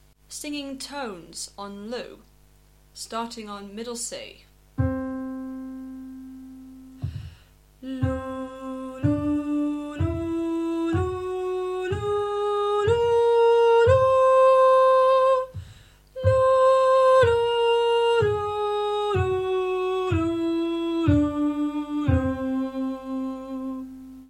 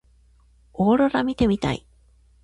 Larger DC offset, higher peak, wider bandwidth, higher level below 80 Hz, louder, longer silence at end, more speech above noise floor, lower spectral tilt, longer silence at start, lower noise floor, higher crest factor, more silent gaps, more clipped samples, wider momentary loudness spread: neither; about the same, -8 dBFS vs -8 dBFS; first, 13 kHz vs 11 kHz; about the same, -46 dBFS vs -44 dBFS; about the same, -23 LUFS vs -22 LUFS; second, 0.05 s vs 0.65 s; second, 21 dB vs 36 dB; about the same, -6 dB/octave vs -7 dB/octave; second, 0.3 s vs 0.8 s; about the same, -56 dBFS vs -56 dBFS; about the same, 16 dB vs 16 dB; neither; neither; first, 19 LU vs 12 LU